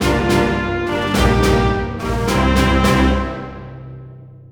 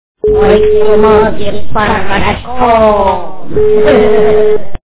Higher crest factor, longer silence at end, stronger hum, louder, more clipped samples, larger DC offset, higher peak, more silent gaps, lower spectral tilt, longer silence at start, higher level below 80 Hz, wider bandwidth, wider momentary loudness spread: about the same, 14 dB vs 10 dB; about the same, 0.2 s vs 0.15 s; neither; second, -16 LUFS vs -9 LUFS; second, under 0.1% vs 1%; second, under 0.1% vs 20%; about the same, -2 dBFS vs 0 dBFS; neither; second, -5.5 dB/octave vs -10 dB/octave; second, 0 s vs 0.15 s; about the same, -24 dBFS vs -26 dBFS; first, over 20 kHz vs 4 kHz; first, 19 LU vs 9 LU